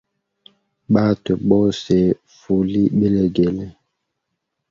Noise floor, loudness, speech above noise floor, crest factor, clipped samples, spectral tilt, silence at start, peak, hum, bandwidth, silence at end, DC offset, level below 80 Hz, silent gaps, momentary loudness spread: -77 dBFS; -18 LUFS; 60 dB; 18 dB; under 0.1%; -8 dB/octave; 0.9 s; 0 dBFS; none; 7.4 kHz; 1 s; under 0.1%; -46 dBFS; none; 6 LU